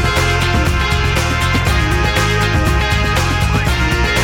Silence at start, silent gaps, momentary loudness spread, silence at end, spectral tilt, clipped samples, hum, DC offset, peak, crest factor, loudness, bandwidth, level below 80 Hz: 0 s; none; 1 LU; 0 s; -4.5 dB/octave; under 0.1%; none; under 0.1%; -2 dBFS; 10 dB; -14 LUFS; 17.5 kHz; -20 dBFS